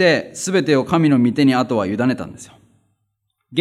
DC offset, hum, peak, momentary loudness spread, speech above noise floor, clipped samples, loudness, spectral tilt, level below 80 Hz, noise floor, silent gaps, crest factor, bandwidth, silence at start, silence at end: under 0.1%; none; -2 dBFS; 9 LU; 56 dB; under 0.1%; -17 LUFS; -5.5 dB/octave; -60 dBFS; -72 dBFS; none; 16 dB; 13 kHz; 0 s; 0 s